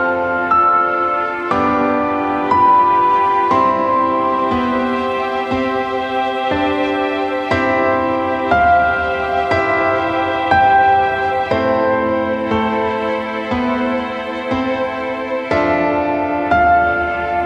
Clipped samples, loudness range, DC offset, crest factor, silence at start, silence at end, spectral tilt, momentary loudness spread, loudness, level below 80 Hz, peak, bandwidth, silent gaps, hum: under 0.1%; 4 LU; under 0.1%; 16 dB; 0 s; 0 s; -6.5 dB/octave; 7 LU; -16 LUFS; -42 dBFS; 0 dBFS; 9 kHz; none; none